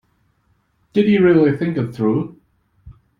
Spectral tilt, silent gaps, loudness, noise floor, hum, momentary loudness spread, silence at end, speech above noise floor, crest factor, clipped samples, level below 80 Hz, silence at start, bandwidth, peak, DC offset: -9.5 dB/octave; none; -17 LUFS; -63 dBFS; none; 10 LU; 0.3 s; 47 dB; 16 dB; under 0.1%; -54 dBFS; 0.95 s; 5.2 kHz; -4 dBFS; under 0.1%